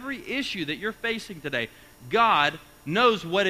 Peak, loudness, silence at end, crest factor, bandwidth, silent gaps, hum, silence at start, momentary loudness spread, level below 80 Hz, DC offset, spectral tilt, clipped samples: -6 dBFS; -25 LUFS; 0 s; 20 dB; 15.5 kHz; none; none; 0 s; 10 LU; -58 dBFS; under 0.1%; -4.5 dB/octave; under 0.1%